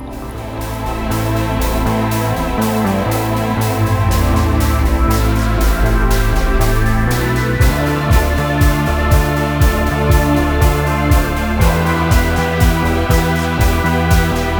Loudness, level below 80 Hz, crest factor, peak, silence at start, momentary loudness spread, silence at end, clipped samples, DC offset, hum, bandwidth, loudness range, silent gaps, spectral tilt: -15 LUFS; -18 dBFS; 14 dB; 0 dBFS; 0 s; 3 LU; 0 s; under 0.1%; under 0.1%; none; over 20 kHz; 2 LU; none; -6 dB/octave